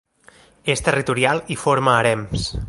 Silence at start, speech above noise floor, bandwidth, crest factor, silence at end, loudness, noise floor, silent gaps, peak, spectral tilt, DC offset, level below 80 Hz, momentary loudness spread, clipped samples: 0.65 s; 32 dB; 11.5 kHz; 18 dB; 0 s; -19 LUFS; -51 dBFS; none; -2 dBFS; -4.5 dB/octave; under 0.1%; -38 dBFS; 7 LU; under 0.1%